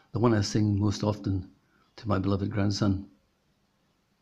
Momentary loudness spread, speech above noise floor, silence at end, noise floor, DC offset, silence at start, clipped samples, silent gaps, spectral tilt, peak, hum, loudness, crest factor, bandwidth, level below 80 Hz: 8 LU; 44 dB; 1.15 s; -71 dBFS; under 0.1%; 0.15 s; under 0.1%; none; -6.5 dB/octave; -10 dBFS; none; -28 LUFS; 18 dB; 8.4 kHz; -56 dBFS